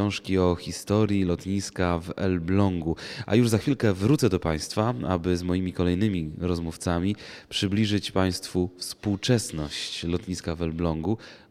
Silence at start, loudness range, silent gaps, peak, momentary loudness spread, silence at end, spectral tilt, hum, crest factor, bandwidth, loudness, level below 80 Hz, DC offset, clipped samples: 0 s; 3 LU; none; -8 dBFS; 8 LU; 0.15 s; -6 dB/octave; none; 18 dB; 15 kHz; -26 LUFS; -46 dBFS; under 0.1%; under 0.1%